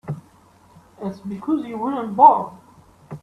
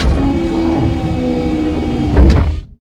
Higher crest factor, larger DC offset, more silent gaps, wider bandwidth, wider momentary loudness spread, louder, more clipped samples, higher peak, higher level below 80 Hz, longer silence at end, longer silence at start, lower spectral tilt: first, 20 dB vs 12 dB; neither; neither; about the same, 8.4 kHz vs 9.2 kHz; first, 21 LU vs 6 LU; second, -19 LUFS vs -15 LUFS; second, under 0.1% vs 0.2%; about the same, 0 dBFS vs 0 dBFS; second, -62 dBFS vs -16 dBFS; about the same, 0.05 s vs 0.05 s; about the same, 0.05 s vs 0 s; about the same, -8.5 dB/octave vs -8 dB/octave